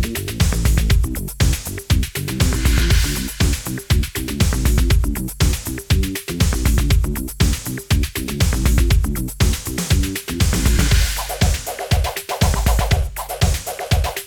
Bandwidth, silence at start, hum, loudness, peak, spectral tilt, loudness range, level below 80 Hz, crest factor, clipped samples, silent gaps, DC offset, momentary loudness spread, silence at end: over 20 kHz; 0 s; none; -19 LUFS; -2 dBFS; -4.5 dB/octave; 1 LU; -20 dBFS; 14 dB; under 0.1%; none; 0.4%; 7 LU; 0 s